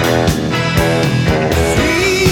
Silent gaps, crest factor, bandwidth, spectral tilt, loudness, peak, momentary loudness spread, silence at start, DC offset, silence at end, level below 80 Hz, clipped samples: none; 12 dB; 19 kHz; -5 dB/octave; -13 LUFS; 0 dBFS; 2 LU; 0 s; under 0.1%; 0 s; -26 dBFS; under 0.1%